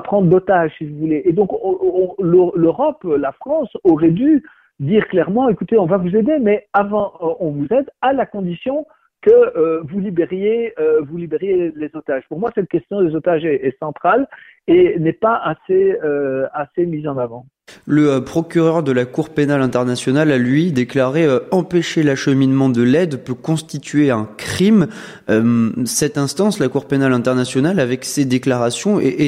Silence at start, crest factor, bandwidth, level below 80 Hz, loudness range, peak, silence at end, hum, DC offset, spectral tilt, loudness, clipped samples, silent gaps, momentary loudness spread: 0 s; 16 dB; 14 kHz; -54 dBFS; 3 LU; 0 dBFS; 0 s; none; under 0.1%; -6.5 dB/octave; -16 LUFS; under 0.1%; none; 8 LU